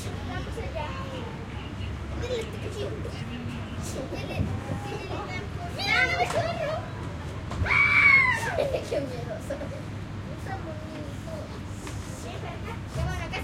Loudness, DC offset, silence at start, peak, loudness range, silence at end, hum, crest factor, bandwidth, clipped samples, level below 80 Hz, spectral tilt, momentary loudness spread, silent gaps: -28 LUFS; under 0.1%; 0 s; -8 dBFS; 13 LU; 0 s; none; 22 dB; 16 kHz; under 0.1%; -42 dBFS; -5 dB/octave; 15 LU; none